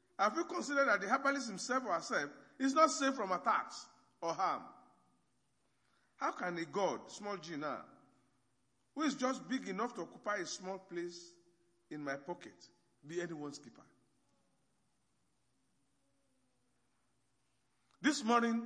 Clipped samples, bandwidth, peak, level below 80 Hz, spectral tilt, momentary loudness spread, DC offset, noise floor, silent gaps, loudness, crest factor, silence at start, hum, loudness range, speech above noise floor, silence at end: under 0.1%; 10.5 kHz; -14 dBFS; under -90 dBFS; -3.5 dB/octave; 15 LU; under 0.1%; -81 dBFS; none; -37 LUFS; 26 dB; 0.2 s; none; 14 LU; 44 dB; 0 s